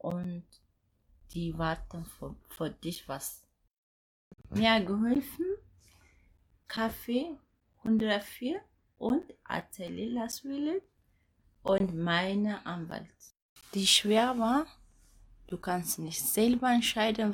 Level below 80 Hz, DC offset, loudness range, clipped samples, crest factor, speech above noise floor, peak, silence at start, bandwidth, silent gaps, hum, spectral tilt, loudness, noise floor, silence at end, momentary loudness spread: -58 dBFS; under 0.1%; 10 LU; under 0.1%; 22 dB; 39 dB; -10 dBFS; 0.05 s; 19 kHz; 3.78-4.31 s, 13.42-13.56 s; none; -4 dB/octave; -31 LUFS; -70 dBFS; 0 s; 16 LU